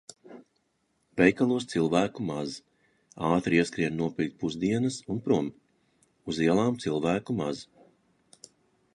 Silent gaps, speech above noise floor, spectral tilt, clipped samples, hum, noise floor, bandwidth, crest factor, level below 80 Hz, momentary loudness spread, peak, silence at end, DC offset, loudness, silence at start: none; 47 dB; -6 dB/octave; under 0.1%; none; -74 dBFS; 11.5 kHz; 24 dB; -60 dBFS; 13 LU; -6 dBFS; 1.3 s; under 0.1%; -28 LUFS; 0.25 s